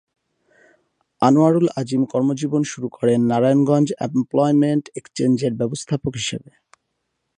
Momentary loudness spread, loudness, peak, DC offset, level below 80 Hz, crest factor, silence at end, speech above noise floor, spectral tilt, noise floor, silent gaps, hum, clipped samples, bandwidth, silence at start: 9 LU; -19 LUFS; -2 dBFS; under 0.1%; -58 dBFS; 18 dB; 1 s; 56 dB; -6.5 dB/octave; -75 dBFS; none; none; under 0.1%; 10.5 kHz; 1.2 s